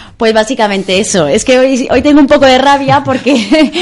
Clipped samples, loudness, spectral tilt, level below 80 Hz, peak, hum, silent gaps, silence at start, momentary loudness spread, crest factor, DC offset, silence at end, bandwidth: 0.4%; -8 LUFS; -4 dB/octave; -36 dBFS; 0 dBFS; none; none; 0 s; 5 LU; 8 dB; under 0.1%; 0 s; 11.5 kHz